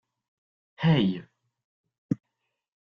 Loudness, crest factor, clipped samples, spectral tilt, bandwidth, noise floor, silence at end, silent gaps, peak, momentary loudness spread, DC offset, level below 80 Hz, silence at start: -27 LUFS; 20 dB; under 0.1%; -6 dB/octave; 5.6 kHz; -82 dBFS; 0.65 s; 1.64-1.84 s, 1.98-2.09 s; -12 dBFS; 11 LU; under 0.1%; -64 dBFS; 0.8 s